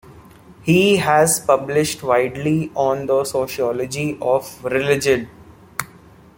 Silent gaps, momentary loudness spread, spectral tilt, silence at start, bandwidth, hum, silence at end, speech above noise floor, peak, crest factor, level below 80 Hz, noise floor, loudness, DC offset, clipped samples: none; 14 LU; -4.5 dB/octave; 0.1 s; 17 kHz; none; 0.5 s; 28 dB; 0 dBFS; 18 dB; -52 dBFS; -46 dBFS; -18 LUFS; under 0.1%; under 0.1%